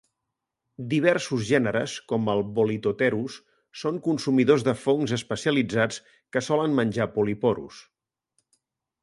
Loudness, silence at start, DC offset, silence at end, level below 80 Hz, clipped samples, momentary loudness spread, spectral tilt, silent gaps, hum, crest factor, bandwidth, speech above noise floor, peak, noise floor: -25 LUFS; 0.8 s; under 0.1%; 1.2 s; -62 dBFS; under 0.1%; 10 LU; -5.5 dB/octave; none; none; 20 dB; 11.5 kHz; 59 dB; -6 dBFS; -84 dBFS